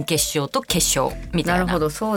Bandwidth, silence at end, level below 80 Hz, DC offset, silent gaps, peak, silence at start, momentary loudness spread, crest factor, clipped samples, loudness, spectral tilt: 20 kHz; 0 s; -36 dBFS; under 0.1%; none; -2 dBFS; 0 s; 5 LU; 18 dB; under 0.1%; -20 LUFS; -3.5 dB/octave